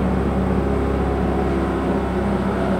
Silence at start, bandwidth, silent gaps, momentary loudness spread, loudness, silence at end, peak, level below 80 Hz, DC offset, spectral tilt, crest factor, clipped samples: 0 s; 10.5 kHz; none; 1 LU; -21 LUFS; 0 s; -8 dBFS; -26 dBFS; under 0.1%; -8.5 dB/octave; 12 dB; under 0.1%